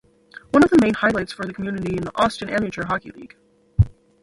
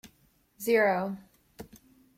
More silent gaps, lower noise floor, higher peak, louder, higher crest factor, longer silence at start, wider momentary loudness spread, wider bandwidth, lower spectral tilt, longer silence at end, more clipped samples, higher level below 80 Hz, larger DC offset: neither; second, -46 dBFS vs -66 dBFS; first, -2 dBFS vs -14 dBFS; first, -21 LUFS vs -28 LUFS; about the same, 18 dB vs 18 dB; about the same, 0.55 s vs 0.6 s; second, 13 LU vs 25 LU; second, 11.5 kHz vs 16 kHz; first, -7 dB/octave vs -5 dB/octave; second, 0.35 s vs 0.5 s; neither; first, -36 dBFS vs -68 dBFS; neither